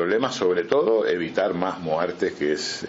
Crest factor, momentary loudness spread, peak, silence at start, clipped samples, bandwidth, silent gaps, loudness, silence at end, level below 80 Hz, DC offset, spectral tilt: 20 dB; 5 LU; -2 dBFS; 0 s; under 0.1%; 8 kHz; none; -23 LUFS; 0 s; -64 dBFS; under 0.1%; -3.5 dB/octave